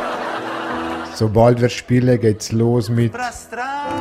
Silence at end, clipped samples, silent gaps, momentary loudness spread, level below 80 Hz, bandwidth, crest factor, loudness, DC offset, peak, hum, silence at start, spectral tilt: 0 s; under 0.1%; none; 11 LU; -44 dBFS; 14 kHz; 16 dB; -18 LUFS; under 0.1%; -2 dBFS; none; 0 s; -6.5 dB/octave